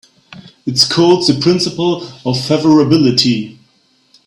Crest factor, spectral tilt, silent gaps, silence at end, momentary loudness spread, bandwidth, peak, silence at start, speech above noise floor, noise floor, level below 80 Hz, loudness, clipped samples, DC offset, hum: 14 dB; -5 dB/octave; none; 0.75 s; 10 LU; 15.5 kHz; 0 dBFS; 0.3 s; 43 dB; -55 dBFS; -50 dBFS; -12 LUFS; under 0.1%; under 0.1%; none